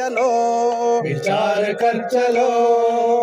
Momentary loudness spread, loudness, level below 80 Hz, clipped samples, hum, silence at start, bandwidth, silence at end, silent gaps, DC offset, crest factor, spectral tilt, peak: 3 LU; -18 LUFS; -70 dBFS; under 0.1%; none; 0 s; 11 kHz; 0 s; none; under 0.1%; 10 dB; -5 dB/octave; -6 dBFS